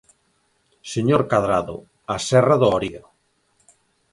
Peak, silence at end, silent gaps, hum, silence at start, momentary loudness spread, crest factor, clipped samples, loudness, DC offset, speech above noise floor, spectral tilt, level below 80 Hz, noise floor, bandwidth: -4 dBFS; 1.15 s; none; none; 0.85 s; 16 LU; 18 dB; under 0.1%; -20 LUFS; under 0.1%; 47 dB; -6 dB/octave; -52 dBFS; -66 dBFS; 11.5 kHz